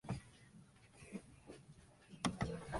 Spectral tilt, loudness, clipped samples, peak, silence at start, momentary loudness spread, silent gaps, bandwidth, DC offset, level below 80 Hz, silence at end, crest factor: -5 dB/octave; -46 LUFS; under 0.1%; -20 dBFS; 0.05 s; 22 LU; none; 11.5 kHz; under 0.1%; -62 dBFS; 0 s; 28 dB